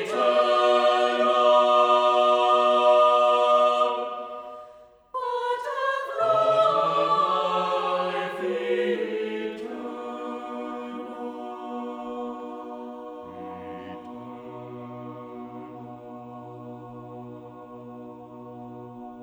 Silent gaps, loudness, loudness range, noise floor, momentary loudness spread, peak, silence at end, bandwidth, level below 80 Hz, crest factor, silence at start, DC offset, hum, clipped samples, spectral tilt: none; -23 LUFS; 21 LU; -50 dBFS; 22 LU; -8 dBFS; 0 s; 10.5 kHz; -70 dBFS; 18 dB; 0 s; under 0.1%; none; under 0.1%; -4.5 dB/octave